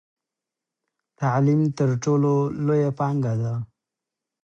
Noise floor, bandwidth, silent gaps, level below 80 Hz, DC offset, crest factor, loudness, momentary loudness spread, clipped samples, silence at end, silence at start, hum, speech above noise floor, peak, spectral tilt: -87 dBFS; 7.4 kHz; none; -62 dBFS; under 0.1%; 14 dB; -23 LUFS; 8 LU; under 0.1%; 0.8 s; 1.2 s; none; 66 dB; -10 dBFS; -8.5 dB/octave